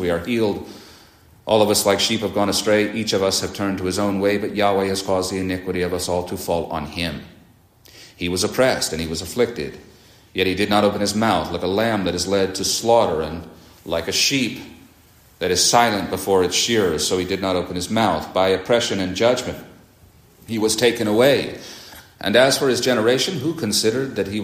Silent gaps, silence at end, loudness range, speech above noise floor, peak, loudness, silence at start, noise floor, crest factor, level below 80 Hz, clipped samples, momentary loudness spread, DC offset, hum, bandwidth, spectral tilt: none; 0 s; 5 LU; 32 dB; -2 dBFS; -20 LUFS; 0 s; -51 dBFS; 20 dB; -52 dBFS; under 0.1%; 11 LU; under 0.1%; none; 15.5 kHz; -3.5 dB/octave